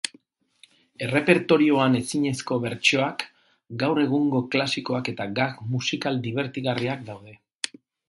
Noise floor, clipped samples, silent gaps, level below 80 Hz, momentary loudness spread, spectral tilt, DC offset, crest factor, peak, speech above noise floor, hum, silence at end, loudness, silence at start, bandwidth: -59 dBFS; under 0.1%; 7.55-7.59 s; -64 dBFS; 14 LU; -5 dB/octave; under 0.1%; 24 dB; -2 dBFS; 35 dB; none; 0.4 s; -24 LUFS; 0.05 s; 11.5 kHz